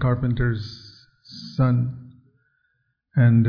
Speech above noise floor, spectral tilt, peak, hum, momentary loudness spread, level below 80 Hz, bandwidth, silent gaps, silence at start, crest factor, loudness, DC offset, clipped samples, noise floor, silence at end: 51 dB; -9 dB/octave; -8 dBFS; none; 21 LU; -42 dBFS; 5.4 kHz; none; 0 s; 16 dB; -23 LUFS; under 0.1%; under 0.1%; -71 dBFS; 0 s